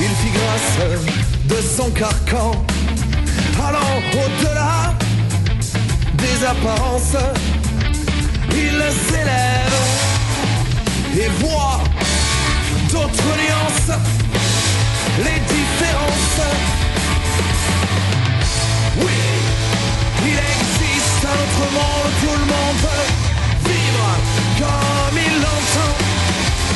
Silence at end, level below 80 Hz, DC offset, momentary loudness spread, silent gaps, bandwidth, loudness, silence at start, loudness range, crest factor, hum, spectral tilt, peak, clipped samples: 0 s; -24 dBFS; under 0.1%; 3 LU; none; 12 kHz; -17 LUFS; 0 s; 1 LU; 14 dB; none; -4 dB/octave; -4 dBFS; under 0.1%